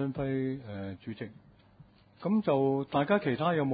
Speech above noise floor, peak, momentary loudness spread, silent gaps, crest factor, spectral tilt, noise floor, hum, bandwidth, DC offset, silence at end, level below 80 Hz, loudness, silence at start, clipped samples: 28 dB; -12 dBFS; 14 LU; none; 20 dB; -11 dB/octave; -58 dBFS; none; 5 kHz; under 0.1%; 0 s; -62 dBFS; -31 LUFS; 0 s; under 0.1%